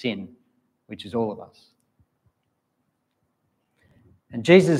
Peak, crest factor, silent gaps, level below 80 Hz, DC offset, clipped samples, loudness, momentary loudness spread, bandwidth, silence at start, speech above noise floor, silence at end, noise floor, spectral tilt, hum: -2 dBFS; 24 dB; none; -68 dBFS; under 0.1%; under 0.1%; -23 LUFS; 25 LU; 11.5 kHz; 0.05 s; 53 dB; 0 s; -75 dBFS; -6.5 dB/octave; none